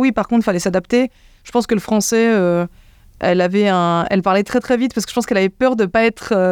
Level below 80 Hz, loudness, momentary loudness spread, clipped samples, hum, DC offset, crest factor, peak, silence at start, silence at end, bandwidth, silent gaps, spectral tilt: -48 dBFS; -16 LUFS; 6 LU; under 0.1%; none; under 0.1%; 14 dB; -2 dBFS; 0 s; 0 s; 18 kHz; none; -5 dB/octave